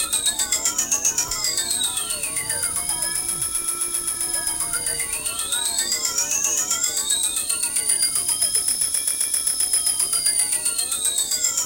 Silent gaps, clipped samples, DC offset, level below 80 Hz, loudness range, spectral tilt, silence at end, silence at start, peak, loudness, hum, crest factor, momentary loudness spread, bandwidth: none; under 0.1%; under 0.1%; -50 dBFS; 3 LU; 1.5 dB/octave; 0 s; 0 s; -6 dBFS; -20 LUFS; none; 16 dB; 4 LU; 17.5 kHz